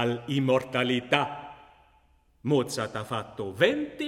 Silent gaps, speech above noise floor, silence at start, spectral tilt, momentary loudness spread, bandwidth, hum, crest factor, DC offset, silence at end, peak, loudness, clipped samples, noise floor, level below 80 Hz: none; 36 dB; 0 s; -5.5 dB/octave; 12 LU; 16 kHz; none; 24 dB; under 0.1%; 0 s; -6 dBFS; -27 LUFS; under 0.1%; -63 dBFS; -64 dBFS